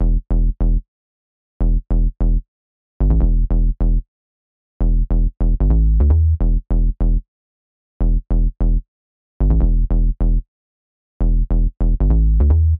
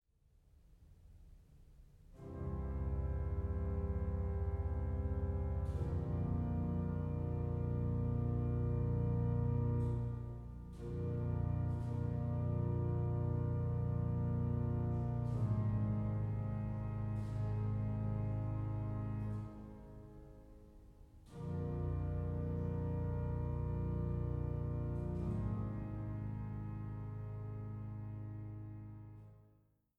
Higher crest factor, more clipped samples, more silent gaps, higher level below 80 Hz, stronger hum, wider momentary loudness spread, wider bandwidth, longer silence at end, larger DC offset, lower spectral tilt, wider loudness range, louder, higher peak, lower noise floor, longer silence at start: about the same, 12 dB vs 12 dB; neither; first, 0.88-1.60 s, 2.48-3.00 s, 4.08-4.80 s, 7.28-8.00 s, 8.88-9.40 s, 10.48-11.20 s vs none; first, -16 dBFS vs -46 dBFS; neither; second, 8 LU vs 11 LU; second, 1.6 kHz vs 3.5 kHz; second, 0 s vs 0.6 s; neither; first, -14 dB/octave vs -11 dB/octave; second, 3 LU vs 8 LU; first, -20 LUFS vs -40 LUFS; first, -4 dBFS vs -26 dBFS; first, under -90 dBFS vs -72 dBFS; second, 0 s vs 0.7 s